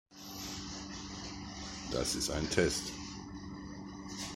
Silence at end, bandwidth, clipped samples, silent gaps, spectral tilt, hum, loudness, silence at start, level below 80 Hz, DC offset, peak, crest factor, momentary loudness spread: 0 s; 16 kHz; under 0.1%; none; -3.5 dB/octave; none; -38 LUFS; 0.1 s; -52 dBFS; under 0.1%; -14 dBFS; 24 dB; 15 LU